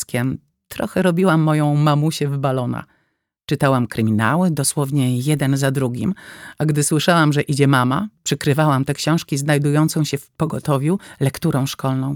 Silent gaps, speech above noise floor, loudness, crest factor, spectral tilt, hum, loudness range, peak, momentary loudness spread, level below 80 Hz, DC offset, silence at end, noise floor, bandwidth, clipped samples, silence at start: none; 51 dB; -18 LUFS; 16 dB; -5.5 dB/octave; none; 2 LU; -2 dBFS; 9 LU; -54 dBFS; under 0.1%; 0 s; -69 dBFS; 18.5 kHz; under 0.1%; 0 s